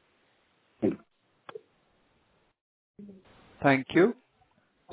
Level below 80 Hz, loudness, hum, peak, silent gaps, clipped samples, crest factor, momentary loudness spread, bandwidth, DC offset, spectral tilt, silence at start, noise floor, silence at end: -68 dBFS; -27 LUFS; none; -10 dBFS; 2.61-2.94 s; under 0.1%; 22 dB; 27 LU; 4 kHz; under 0.1%; -5 dB/octave; 0.8 s; -69 dBFS; 0.8 s